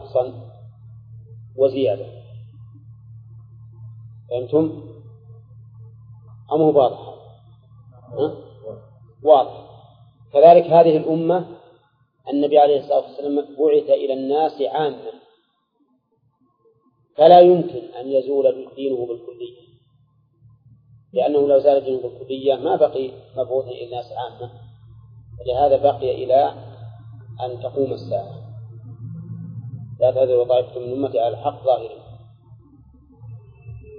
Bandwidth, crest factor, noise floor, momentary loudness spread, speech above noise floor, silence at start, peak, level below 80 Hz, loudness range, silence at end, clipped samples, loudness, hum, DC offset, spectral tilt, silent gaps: 5.2 kHz; 20 dB; -66 dBFS; 24 LU; 48 dB; 0 s; 0 dBFS; -56 dBFS; 11 LU; 0 s; under 0.1%; -18 LUFS; none; under 0.1%; -10 dB/octave; none